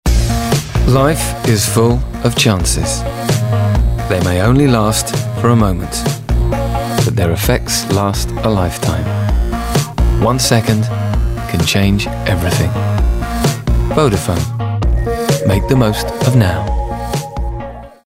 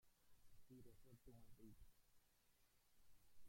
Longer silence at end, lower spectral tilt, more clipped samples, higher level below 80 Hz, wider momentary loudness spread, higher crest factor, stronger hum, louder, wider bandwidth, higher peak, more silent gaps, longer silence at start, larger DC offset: first, 0.15 s vs 0 s; about the same, -5 dB/octave vs -5.5 dB/octave; neither; first, -20 dBFS vs -76 dBFS; first, 6 LU vs 1 LU; about the same, 12 dB vs 14 dB; neither; first, -14 LUFS vs -69 LUFS; about the same, 16.5 kHz vs 16.5 kHz; first, -2 dBFS vs -52 dBFS; neither; about the same, 0.05 s vs 0 s; neither